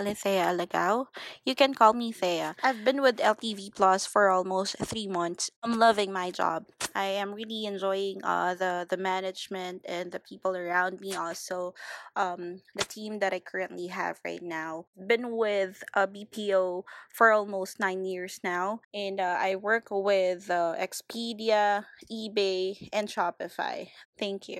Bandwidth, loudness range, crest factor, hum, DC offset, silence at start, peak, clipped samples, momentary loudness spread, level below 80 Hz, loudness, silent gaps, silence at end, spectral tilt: 15.5 kHz; 7 LU; 24 dB; none; under 0.1%; 0 s; -6 dBFS; under 0.1%; 12 LU; -72 dBFS; -29 LUFS; 5.56-5.62 s, 14.87-14.93 s, 18.85-18.91 s, 24.05-24.13 s; 0 s; -3.5 dB/octave